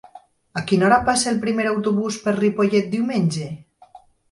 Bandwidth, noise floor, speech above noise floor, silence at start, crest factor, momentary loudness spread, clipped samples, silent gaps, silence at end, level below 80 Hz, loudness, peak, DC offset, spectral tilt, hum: 11.5 kHz; -49 dBFS; 29 dB; 0.15 s; 18 dB; 13 LU; under 0.1%; none; 0.35 s; -52 dBFS; -20 LUFS; -4 dBFS; under 0.1%; -5 dB/octave; none